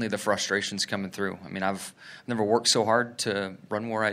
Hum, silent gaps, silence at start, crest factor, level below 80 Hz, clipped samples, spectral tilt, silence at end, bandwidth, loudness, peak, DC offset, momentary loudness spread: none; none; 0 s; 20 dB; -72 dBFS; under 0.1%; -3 dB/octave; 0 s; 16 kHz; -27 LUFS; -8 dBFS; under 0.1%; 12 LU